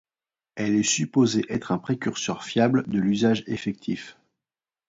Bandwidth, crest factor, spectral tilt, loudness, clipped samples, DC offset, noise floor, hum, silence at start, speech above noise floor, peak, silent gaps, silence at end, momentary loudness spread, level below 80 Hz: 7.8 kHz; 18 dB; -4.5 dB/octave; -24 LUFS; under 0.1%; under 0.1%; under -90 dBFS; none; 0.55 s; over 66 dB; -8 dBFS; none; 0.8 s; 10 LU; -62 dBFS